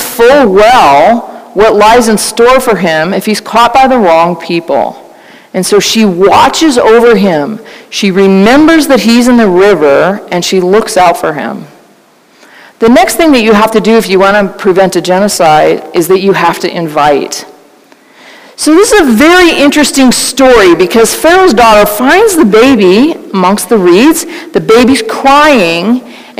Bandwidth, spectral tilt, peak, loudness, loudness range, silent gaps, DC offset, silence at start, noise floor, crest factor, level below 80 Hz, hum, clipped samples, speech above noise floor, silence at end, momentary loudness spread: 16.5 kHz; -4 dB/octave; 0 dBFS; -5 LUFS; 4 LU; none; under 0.1%; 0 s; -42 dBFS; 6 dB; -36 dBFS; none; 4%; 37 dB; 0.15 s; 9 LU